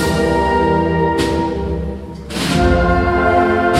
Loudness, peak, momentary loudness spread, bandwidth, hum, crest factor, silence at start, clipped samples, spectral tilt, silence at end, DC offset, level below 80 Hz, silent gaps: -15 LUFS; -2 dBFS; 10 LU; 15 kHz; none; 14 dB; 0 s; under 0.1%; -6 dB/octave; 0 s; under 0.1%; -26 dBFS; none